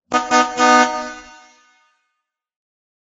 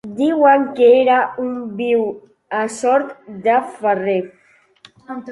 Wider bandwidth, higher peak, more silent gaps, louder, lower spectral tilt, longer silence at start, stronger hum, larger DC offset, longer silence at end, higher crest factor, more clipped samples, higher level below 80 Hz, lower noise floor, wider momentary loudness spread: second, 8 kHz vs 11.5 kHz; about the same, 0 dBFS vs -2 dBFS; neither; about the same, -15 LUFS vs -16 LUFS; second, -1.5 dB/octave vs -5 dB/octave; about the same, 0.1 s vs 0.05 s; neither; neither; first, 1.85 s vs 0 s; about the same, 20 dB vs 16 dB; neither; first, -58 dBFS vs -64 dBFS; first, -77 dBFS vs -49 dBFS; about the same, 18 LU vs 16 LU